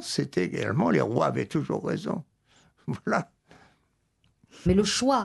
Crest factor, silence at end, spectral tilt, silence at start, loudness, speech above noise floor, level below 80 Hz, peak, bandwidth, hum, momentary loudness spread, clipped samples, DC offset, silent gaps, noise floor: 20 dB; 0 s; -5 dB/octave; 0 s; -27 LUFS; 45 dB; -48 dBFS; -8 dBFS; 12 kHz; none; 12 LU; under 0.1%; under 0.1%; none; -71 dBFS